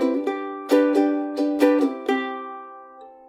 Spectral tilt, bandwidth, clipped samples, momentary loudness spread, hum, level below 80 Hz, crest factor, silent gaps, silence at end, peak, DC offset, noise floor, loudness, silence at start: -4 dB/octave; 15 kHz; under 0.1%; 18 LU; none; -76 dBFS; 18 dB; none; 0.15 s; -4 dBFS; under 0.1%; -44 dBFS; -22 LUFS; 0 s